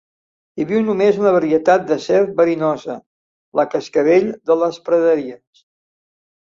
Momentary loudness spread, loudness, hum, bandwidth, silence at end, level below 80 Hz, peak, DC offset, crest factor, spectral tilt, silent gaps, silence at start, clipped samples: 11 LU; -17 LUFS; none; 7.4 kHz; 1.1 s; -60 dBFS; -2 dBFS; under 0.1%; 16 dB; -6.5 dB/octave; 3.06-3.52 s; 0.55 s; under 0.1%